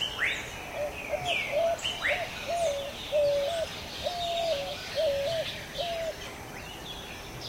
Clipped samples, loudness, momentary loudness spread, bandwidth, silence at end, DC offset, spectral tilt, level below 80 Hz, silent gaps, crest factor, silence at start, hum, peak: under 0.1%; -31 LUFS; 11 LU; 16 kHz; 0 s; under 0.1%; -2.5 dB/octave; -52 dBFS; none; 14 dB; 0 s; none; -16 dBFS